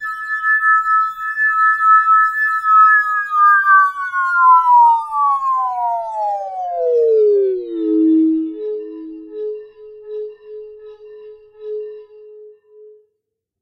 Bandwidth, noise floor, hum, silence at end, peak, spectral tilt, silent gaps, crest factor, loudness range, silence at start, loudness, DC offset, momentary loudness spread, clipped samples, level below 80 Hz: 15 kHz; -76 dBFS; none; 0.75 s; -2 dBFS; -4.5 dB/octave; none; 14 dB; 20 LU; 0 s; -14 LUFS; under 0.1%; 19 LU; under 0.1%; -64 dBFS